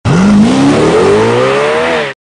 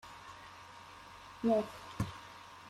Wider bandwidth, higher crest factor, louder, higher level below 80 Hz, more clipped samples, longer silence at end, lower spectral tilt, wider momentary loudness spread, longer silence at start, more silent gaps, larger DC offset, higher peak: second, 10.5 kHz vs 15 kHz; second, 8 dB vs 18 dB; first, -8 LUFS vs -36 LUFS; first, -34 dBFS vs -62 dBFS; neither; about the same, 0.05 s vs 0 s; about the same, -6 dB/octave vs -6.5 dB/octave; second, 4 LU vs 19 LU; about the same, 0.05 s vs 0.05 s; neither; first, 0.1% vs under 0.1%; first, 0 dBFS vs -20 dBFS